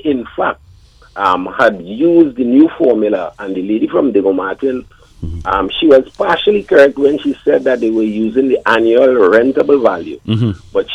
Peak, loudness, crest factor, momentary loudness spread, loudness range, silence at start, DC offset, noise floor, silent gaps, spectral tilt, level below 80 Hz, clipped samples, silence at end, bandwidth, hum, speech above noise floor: 0 dBFS; -13 LUFS; 12 dB; 10 LU; 3 LU; 0.05 s; under 0.1%; -43 dBFS; none; -7.5 dB/octave; -40 dBFS; under 0.1%; 0 s; 8.6 kHz; none; 31 dB